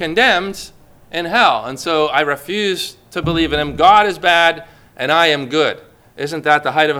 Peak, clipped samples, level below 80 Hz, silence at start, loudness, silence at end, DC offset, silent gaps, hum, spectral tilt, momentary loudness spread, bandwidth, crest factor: 0 dBFS; under 0.1%; -42 dBFS; 0 s; -15 LUFS; 0 s; under 0.1%; none; none; -4 dB/octave; 14 LU; 18 kHz; 16 dB